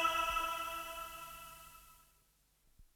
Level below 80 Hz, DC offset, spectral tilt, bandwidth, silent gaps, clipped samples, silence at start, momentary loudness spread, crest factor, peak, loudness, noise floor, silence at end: -62 dBFS; under 0.1%; -1 dB/octave; over 20 kHz; none; under 0.1%; 0 s; 21 LU; 20 dB; -20 dBFS; -39 LUFS; -73 dBFS; 0.1 s